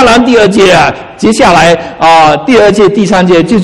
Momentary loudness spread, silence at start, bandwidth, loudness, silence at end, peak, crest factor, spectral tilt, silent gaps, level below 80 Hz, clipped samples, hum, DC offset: 4 LU; 0 s; 14.5 kHz; -5 LUFS; 0 s; 0 dBFS; 4 dB; -5 dB/octave; none; -32 dBFS; 5%; none; 1%